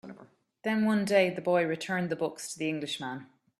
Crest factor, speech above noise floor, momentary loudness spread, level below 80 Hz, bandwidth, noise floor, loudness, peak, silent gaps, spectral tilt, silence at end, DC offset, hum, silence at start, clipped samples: 20 dB; 28 dB; 12 LU; -74 dBFS; 13.5 kHz; -57 dBFS; -30 LUFS; -12 dBFS; none; -5 dB/octave; 0.35 s; under 0.1%; none; 0.05 s; under 0.1%